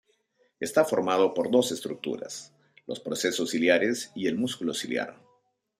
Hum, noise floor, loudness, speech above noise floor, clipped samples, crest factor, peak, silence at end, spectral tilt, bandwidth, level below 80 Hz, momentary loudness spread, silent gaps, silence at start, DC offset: none; -69 dBFS; -27 LUFS; 42 dB; under 0.1%; 22 dB; -8 dBFS; 0.65 s; -3.5 dB/octave; 15.5 kHz; -74 dBFS; 15 LU; none; 0.6 s; under 0.1%